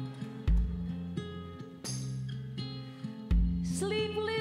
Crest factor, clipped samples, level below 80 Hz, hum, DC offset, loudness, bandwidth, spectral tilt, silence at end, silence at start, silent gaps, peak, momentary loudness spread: 16 dB; under 0.1%; -36 dBFS; none; under 0.1%; -35 LUFS; 13 kHz; -5.5 dB/octave; 0 s; 0 s; none; -18 dBFS; 11 LU